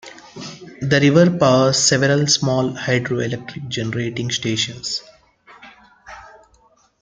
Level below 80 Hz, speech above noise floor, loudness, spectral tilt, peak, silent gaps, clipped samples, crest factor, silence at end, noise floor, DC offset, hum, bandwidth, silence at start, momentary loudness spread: -54 dBFS; 39 dB; -18 LUFS; -4 dB/octave; -2 dBFS; none; under 0.1%; 18 dB; 0.75 s; -56 dBFS; under 0.1%; none; 9.6 kHz; 0.05 s; 20 LU